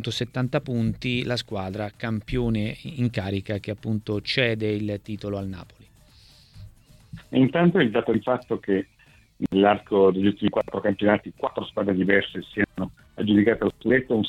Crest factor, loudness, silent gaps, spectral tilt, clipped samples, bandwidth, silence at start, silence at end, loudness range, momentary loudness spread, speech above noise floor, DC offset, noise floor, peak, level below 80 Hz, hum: 20 dB; -24 LUFS; none; -7 dB/octave; under 0.1%; 12.5 kHz; 0 s; 0 s; 6 LU; 11 LU; 30 dB; under 0.1%; -53 dBFS; -4 dBFS; -48 dBFS; none